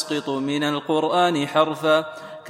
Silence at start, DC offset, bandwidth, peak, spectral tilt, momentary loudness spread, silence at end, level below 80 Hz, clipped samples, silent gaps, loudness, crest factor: 0 s; under 0.1%; 16 kHz; -4 dBFS; -5 dB/octave; 6 LU; 0 s; -72 dBFS; under 0.1%; none; -21 LUFS; 18 dB